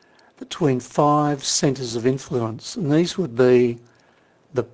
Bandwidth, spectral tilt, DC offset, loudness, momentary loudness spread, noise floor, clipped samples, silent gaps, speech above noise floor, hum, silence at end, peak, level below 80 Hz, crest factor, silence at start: 8 kHz; -5 dB/octave; under 0.1%; -21 LUFS; 11 LU; -57 dBFS; under 0.1%; none; 37 dB; none; 0.05 s; -4 dBFS; -58 dBFS; 16 dB; 0.4 s